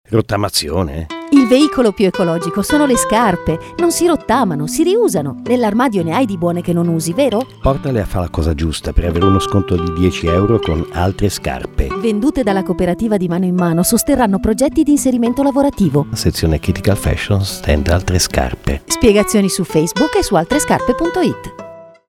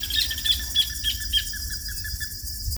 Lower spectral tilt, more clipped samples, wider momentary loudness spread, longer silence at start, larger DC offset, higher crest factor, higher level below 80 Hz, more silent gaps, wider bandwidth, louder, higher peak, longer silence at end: first, -5.5 dB/octave vs 0 dB/octave; neither; second, 6 LU vs 9 LU; about the same, 0.1 s vs 0 s; neither; about the same, 14 dB vs 18 dB; first, -28 dBFS vs -36 dBFS; neither; second, 18 kHz vs over 20 kHz; first, -15 LUFS vs -24 LUFS; first, 0 dBFS vs -8 dBFS; first, 0.2 s vs 0 s